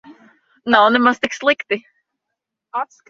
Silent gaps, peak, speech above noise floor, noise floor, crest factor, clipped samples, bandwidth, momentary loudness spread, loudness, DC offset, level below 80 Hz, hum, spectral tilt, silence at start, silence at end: none; 0 dBFS; 64 dB; -81 dBFS; 20 dB; under 0.1%; 7.6 kHz; 14 LU; -17 LUFS; under 0.1%; -62 dBFS; none; -3.5 dB/octave; 0.1 s; 0.25 s